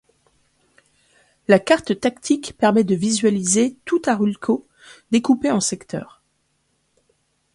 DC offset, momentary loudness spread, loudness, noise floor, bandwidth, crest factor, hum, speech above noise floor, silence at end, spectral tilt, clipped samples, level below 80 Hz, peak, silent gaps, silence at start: under 0.1%; 7 LU; -19 LUFS; -68 dBFS; 11.5 kHz; 20 dB; none; 49 dB; 1.5 s; -4.5 dB/octave; under 0.1%; -60 dBFS; 0 dBFS; none; 1.5 s